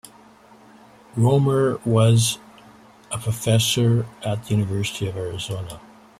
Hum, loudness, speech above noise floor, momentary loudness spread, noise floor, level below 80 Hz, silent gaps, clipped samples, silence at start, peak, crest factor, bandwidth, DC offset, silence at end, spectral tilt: none; -21 LUFS; 29 dB; 15 LU; -49 dBFS; -54 dBFS; none; under 0.1%; 1.15 s; -4 dBFS; 18 dB; 15 kHz; under 0.1%; 0.4 s; -5.5 dB/octave